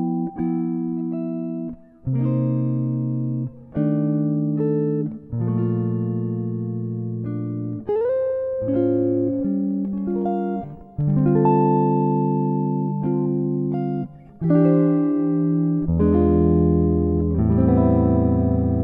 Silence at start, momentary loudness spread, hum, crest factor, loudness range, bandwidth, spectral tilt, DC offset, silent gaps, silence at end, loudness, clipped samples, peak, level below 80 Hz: 0 s; 10 LU; none; 16 dB; 6 LU; 3.3 kHz; -14 dB/octave; under 0.1%; none; 0 s; -21 LUFS; under 0.1%; -6 dBFS; -38 dBFS